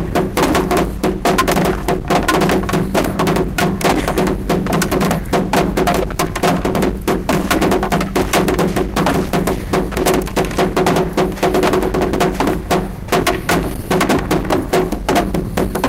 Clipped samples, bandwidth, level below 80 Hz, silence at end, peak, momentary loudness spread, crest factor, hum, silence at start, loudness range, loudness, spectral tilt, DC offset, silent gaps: under 0.1%; 16.5 kHz; -28 dBFS; 0 s; -2 dBFS; 4 LU; 12 dB; none; 0 s; 1 LU; -16 LUFS; -5 dB/octave; under 0.1%; none